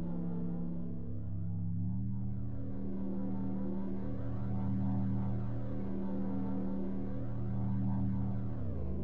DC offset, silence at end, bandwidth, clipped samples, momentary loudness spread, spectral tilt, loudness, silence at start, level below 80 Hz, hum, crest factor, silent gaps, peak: 1%; 0 s; 3.7 kHz; under 0.1%; 6 LU; -12 dB/octave; -38 LUFS; 0 s; -48 dBFS; none; 10 dB; none; -24 dBFS